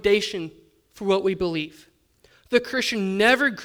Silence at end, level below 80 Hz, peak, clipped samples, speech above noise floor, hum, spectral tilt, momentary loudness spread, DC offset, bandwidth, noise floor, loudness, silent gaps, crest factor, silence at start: 0 s; -54 dBFS; -4 dBFS; under 0.1%; 37 dB; none; -4 dB/octave; 14 LU; under 0.1%; 19.5 kHz; -59 dBFS; -23 LUFS; none; 20 dB; 0.05 s